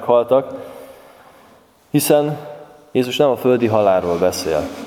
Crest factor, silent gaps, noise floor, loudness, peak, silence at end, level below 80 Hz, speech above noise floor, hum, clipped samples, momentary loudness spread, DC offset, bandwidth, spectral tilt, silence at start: 18 dB; none; -50 dBFS; -17 LUFS; 0 dBFS; 0 s; -52 dBFS; 33 dB; none; under 0.1%; 17 LU; under 0.1%; 18 kHz; -5 dB/octave; 0 s